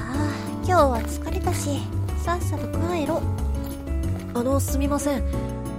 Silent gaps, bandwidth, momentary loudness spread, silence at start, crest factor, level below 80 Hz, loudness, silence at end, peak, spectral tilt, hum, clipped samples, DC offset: none; 16 kHz; 7 LU; 0 s; 18 dB; -30 dBFS; -25 LUFS; 0 s; -6 dBFS; -6 dB/octave; none; under 0.1%; under 0.1%